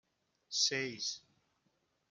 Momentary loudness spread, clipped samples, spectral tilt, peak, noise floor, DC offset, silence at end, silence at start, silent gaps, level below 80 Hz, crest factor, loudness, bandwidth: 9 LU; under 0.1%; -1 dB/octave; -18 dBFS; -79 dBFS; under 0.1%; 0.9 s; 0.5 s; none; -88 dBFS; 22 dB; -35 LUFS; 12 kHz